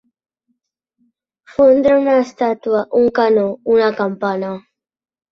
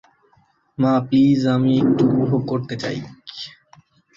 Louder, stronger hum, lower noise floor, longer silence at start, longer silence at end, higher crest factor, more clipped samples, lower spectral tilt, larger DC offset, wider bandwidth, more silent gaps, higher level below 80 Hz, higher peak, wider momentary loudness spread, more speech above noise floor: first, -15 LUFS vs -18 LUFS; neither; first, -71 dBFS vs -60 dBFS; first, 1.6 s vs 0.8 s; about the same, 0.75 s vs 0.65 s; about the same, 16 dB vs 14 dB; neither; about the same, -7 dB/octave vs -8 dB/octave; neither; about the same, 7 kHz vs 7.4 kHz; neither; about the same, -56 dBFS vs -56 dBFS; first, -2 dBFS vs -6 dBFS; second, 10 LU vs 18 LU; first, 56 dB vs 42 dB